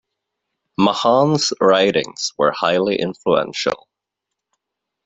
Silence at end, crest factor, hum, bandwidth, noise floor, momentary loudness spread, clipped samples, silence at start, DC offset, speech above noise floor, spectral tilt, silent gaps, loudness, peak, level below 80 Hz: 1.3 s; 16 dB; none; 8.2 kHz; -82 dBFS; 8 LU; under 0.1%; 0.8 s; under 0.1%; 64 dB; -4.5 dB/octave; none; -17 LUFS; -2 dBFS; -60 dBFS